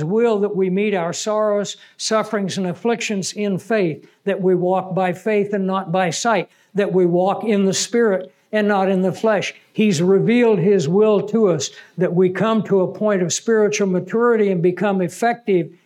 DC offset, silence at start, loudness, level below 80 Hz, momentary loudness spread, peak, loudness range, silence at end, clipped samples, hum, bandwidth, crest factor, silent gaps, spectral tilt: under 0.1%; 0 s; -19 LUFS; -82 dBFS; 7 LU; -6 dBFS; 4 LU; 0.15 s; under 0.1%; none; 13.5 kHz; 12 dB; none; -5.5 dB/octave